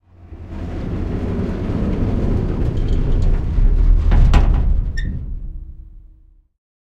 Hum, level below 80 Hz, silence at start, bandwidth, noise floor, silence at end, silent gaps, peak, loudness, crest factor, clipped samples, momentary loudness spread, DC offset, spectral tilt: none; -18 dBFS; 0.2 s; 6 kHz; -48 dBFS; 0.75 s; none; 0 dBFS; -20 LUFS; 16 dB; under 0.1%; 18 LU; under 0.1%; -8.5 dB/octave